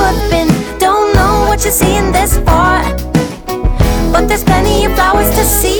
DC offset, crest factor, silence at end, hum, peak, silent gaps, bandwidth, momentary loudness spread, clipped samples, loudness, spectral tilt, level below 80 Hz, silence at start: under 0.1%; 10 dB; 0 s; none; 0 dBFS; none; over 20 kHz; 5 LU; under 0.1%; -11 LUFS; -4.5 dB/octave; -16 dBFS; 0 s